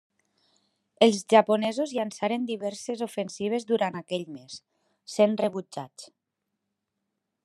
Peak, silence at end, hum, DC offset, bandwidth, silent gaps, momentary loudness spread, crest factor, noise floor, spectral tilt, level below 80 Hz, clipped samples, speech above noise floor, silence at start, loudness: -4 dBFS; 1.4 s; none; under 0.1%; 12.5 kHz; none; 19 LU; 24 dB; -83 dBFS; -4.5 dB/octave; -82 dBFS; under 0.1%; 57 dB; 1 s; -26 LUFS